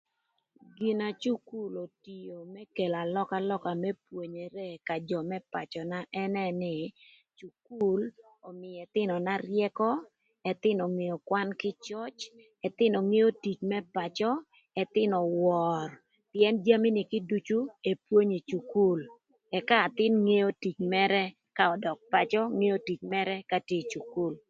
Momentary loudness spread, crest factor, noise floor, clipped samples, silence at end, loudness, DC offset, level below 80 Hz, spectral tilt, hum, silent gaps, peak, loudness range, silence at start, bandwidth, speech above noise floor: 14 LU; 22 dB; -80 dBFS; under 0.1%; 0.1 s; -30 LUFS; under 0.1%; -76 dBFS; -6.5 dB/octave; none; none; -8 dBFS; 7 LU; 0.8 s; 7.6 kHz; 50 dB